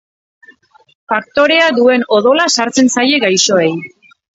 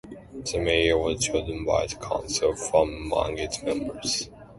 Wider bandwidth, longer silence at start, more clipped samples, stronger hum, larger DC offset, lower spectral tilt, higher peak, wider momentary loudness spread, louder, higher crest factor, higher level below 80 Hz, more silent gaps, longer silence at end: second, 8 kHz vs 12 kHz; first, 1.1 s vs 0.05 s; neither; neither; neither; about the same, -2.5 dB/octave vs -3.5 dB/octave; first, 0 dBFS vs -8 dBFS; about the same, 9 LU vs 8 LU; first, -11 LUFS vs -26 LUFS; second, 14 dB vs 20 dB; second, -58 dBFS vs -42 dBFS; neither; first, 0.5 s vs 0 s